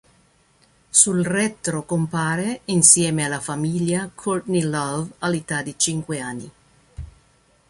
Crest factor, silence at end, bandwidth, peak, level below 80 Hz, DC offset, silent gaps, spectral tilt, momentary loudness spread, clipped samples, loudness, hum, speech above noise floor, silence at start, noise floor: 22 dB; 0.65 s; 11.5 kHz; 0 dBFS; -52 dBFS; under 0.1%; none; -3.5 dB/octave; 14 LU; under 0.1%; -20 LUFS; none; 37 dB; 0.95 s; -59 dBFS